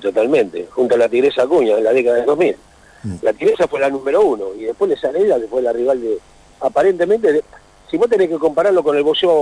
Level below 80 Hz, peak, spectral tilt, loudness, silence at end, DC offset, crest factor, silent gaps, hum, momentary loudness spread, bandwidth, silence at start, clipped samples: -52 dBFS; -4 dBFS; -5.5 dB/octave; -16 LUFS; 0 s; under 0.1%; 10 dB; none; none; 8 LU; 10.5 kHz; 0 s; under 0.1%